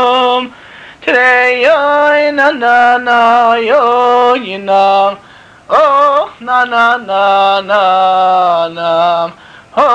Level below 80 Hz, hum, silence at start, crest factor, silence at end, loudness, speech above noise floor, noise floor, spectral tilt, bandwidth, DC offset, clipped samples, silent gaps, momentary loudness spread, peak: -56 dBFS; none; 0 s; 8 dB; 0 s; -10 LUFS; 25 dB; -34 dBFS; -4 dB/octave; 9.2 kHz; under 0.1%; under 0.1%; none; 7 LU; -2 dBFS